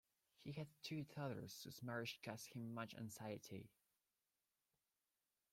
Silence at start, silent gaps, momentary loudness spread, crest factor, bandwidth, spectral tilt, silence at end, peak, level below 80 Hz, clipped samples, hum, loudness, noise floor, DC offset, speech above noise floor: 0.4 s; none; 8 LU; 20 dB; 16.5 kHz; -5 dB/octave; 1.85 s; -34 dBFS; -86 dBFS; under 0.1%; none; -52 LUFS; under -90 dBFS; under 0.1%; over 38 dB